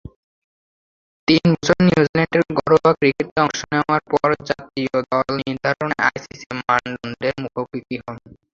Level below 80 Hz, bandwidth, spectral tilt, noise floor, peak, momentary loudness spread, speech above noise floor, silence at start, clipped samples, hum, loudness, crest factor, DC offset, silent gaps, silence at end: -50 dBFS; 7.6 kHz; -6 dB/octave; under -90 dBFS; 0 dBFS; 13 LU; over 71 dB; 1.3 s; under 0.1%; none; -19 LUFS; 20 dB; under 0.1%; 2.09-2.14 s, 3.31-3.36 s, 6.46-6.50 s; 0.35 s